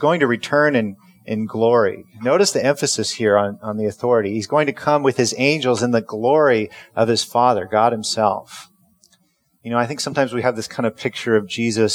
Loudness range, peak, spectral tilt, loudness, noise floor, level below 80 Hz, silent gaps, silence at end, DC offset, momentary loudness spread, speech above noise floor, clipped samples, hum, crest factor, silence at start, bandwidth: 5 LU; -2 dBFS; -4.5 dB/octave; -19 LUFS; -63 dBFS; -66 dBFS; none; 0 s; under 0.1%; 8 LU; 45 dB; under 0.1%; none; 18 dB; 0 s; 16.5 kHz